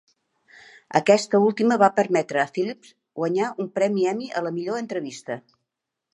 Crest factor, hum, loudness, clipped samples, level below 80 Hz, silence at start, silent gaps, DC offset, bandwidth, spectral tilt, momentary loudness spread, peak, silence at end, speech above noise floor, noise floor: 22 dB; none; -23 LUFS; under 0.1%; -76 dBFS; 0.9 s; none; under 0.1%; 11 kHz; -5.5 dB/octave; 14 LU; -2 dBFS; 0.75 s; 61 dB; -83 dBFS